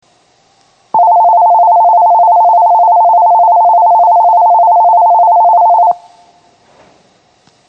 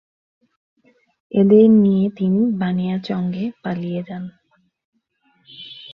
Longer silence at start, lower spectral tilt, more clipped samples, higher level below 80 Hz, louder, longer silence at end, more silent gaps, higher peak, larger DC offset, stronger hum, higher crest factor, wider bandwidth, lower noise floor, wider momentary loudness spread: second, 0.95 s vs 1.35 s; second, -5.5 dB/octave vs -10.5 dB/octave; neither; second, -70 dBFS vs -62 dBFS; first, -7 LUFS vs -18 LUFS; first, 1.7 s vs 0 s; second, none vs 4.85-4.92 s; about the same, -2 dBFS vs -2 dBFS; neither; neither; second, 6 dB vs 16 dB; about the same, 5.4 kHz vs 5.6 kHz; second, -51 dBFS vs -63 dBFS; second, 2 LU vs 22 LU